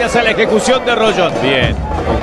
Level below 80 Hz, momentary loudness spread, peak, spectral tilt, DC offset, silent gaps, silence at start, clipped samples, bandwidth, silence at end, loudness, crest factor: -26 dBFS; 5 LU; 0 dBFS; -4.5 dB/octave; under 0.1%; none; 0 s; under 0.1%; 12.5 kHz; 0 s; -13 LUFS; 12 dB